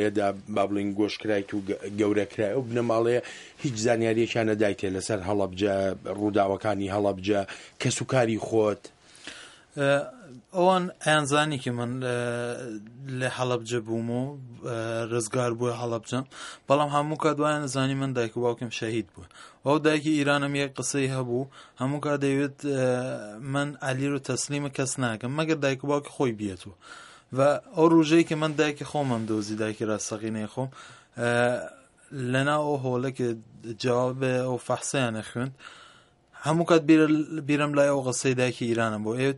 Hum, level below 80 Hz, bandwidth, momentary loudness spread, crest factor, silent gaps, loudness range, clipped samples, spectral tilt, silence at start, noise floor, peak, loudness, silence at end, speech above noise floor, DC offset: none; -66 dBFS; 11.5 kHz; 12 LU; 20 dB; none; 4 LU; under 0.1%; -5.5 dB/octave; 0 s; -56 dBFS; -6 dBFS; -27 LUFS; 0 s; 30 dB; under 0.1%